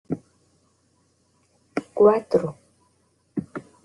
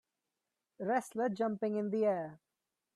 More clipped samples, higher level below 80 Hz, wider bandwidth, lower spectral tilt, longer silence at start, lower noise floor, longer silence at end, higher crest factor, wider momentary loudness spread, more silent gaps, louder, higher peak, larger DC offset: neither; first, -66 dBFS vs -84 dBFS; second, 10.5 kHz vs 13 kHz; about the same, -8 dB/octave vs -7 dB/octave; second, 0.1 s vs 0.8 s; second, -65 dBFS vs -89 dBFS; second, 0.25 s vs 0.6 s; about the same, 22 dB vs 18 dB; first, 16 LU vs 8 LU; neither; first, -23 LUFS vs -35 LUFS; first, -4 dBFS vs -20 dBFS; neither